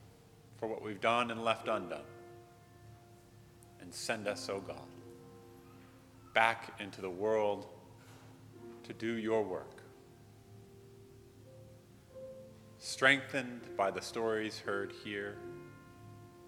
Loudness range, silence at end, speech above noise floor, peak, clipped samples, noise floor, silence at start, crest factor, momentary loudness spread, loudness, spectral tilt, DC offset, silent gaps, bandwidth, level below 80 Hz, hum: 9 LU; 0 s; 24 dB; -10 dBFS; under 0.1%; -59 dBFS; 0 s; 28 dB; 25 LU; -36 LUFS; -4 dB/octave; under 0.1%; none; 18.5 kHz; -72 dBFS; none